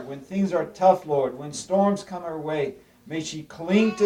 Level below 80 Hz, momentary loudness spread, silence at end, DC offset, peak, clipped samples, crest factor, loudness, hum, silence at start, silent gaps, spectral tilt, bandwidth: -62 dBFS; 13 LU; 0 s; under 0.1%; -4 dBFS; under 0.1%; 20 dB; -25 LUFS; none; 0 s; none; -6 dB/octave; 11.5 kHz